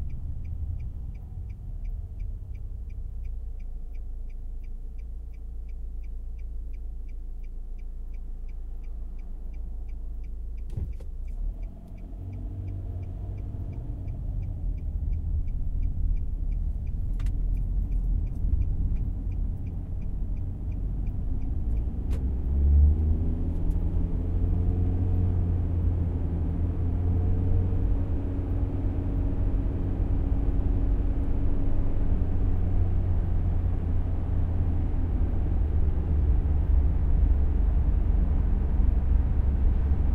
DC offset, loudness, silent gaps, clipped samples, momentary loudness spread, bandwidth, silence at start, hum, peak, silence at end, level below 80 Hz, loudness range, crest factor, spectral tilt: under 0.1%; -30 LUFS; none; under 0.1%; 15 LU; 3.2 kHz; 0 s; none; -10 dBFS; 0 s; -28 dBFS; 14 LU; 16 dB; -11 dB/octave